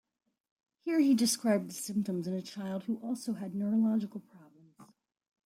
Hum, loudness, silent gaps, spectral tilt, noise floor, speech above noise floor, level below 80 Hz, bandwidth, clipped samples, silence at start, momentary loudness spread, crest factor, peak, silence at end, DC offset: none; -32 LUFS; none; -5 dB/octave; -60 dBFS; 29 dB; -80 dBFS; 16 kHz; under 0.1%; 0.85 s; 11 LU; 16 dB; -18 dBFS; 0.6 s; under 0.1%